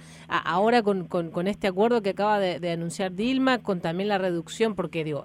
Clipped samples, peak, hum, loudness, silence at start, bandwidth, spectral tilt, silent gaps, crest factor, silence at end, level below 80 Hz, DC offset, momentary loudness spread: under 0.1%; -10 dBFS; none; -26 LUFS; 0 s; 13.5 kHz; -5.5 dB/octave; none; 16 dB; 0 s; -60 dBFS; under 0.1%; 7 LU